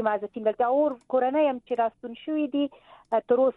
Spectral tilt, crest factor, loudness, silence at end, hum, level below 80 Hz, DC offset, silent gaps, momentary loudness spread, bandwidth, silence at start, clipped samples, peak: -7.5 dB/octave; 14 dB; -26 LUFS; 0.05 s; none; -72 dBFS; under 0.1%; none; 6 LU; 4.1 kHz; 0 s; under 0.1%; -12 dBFS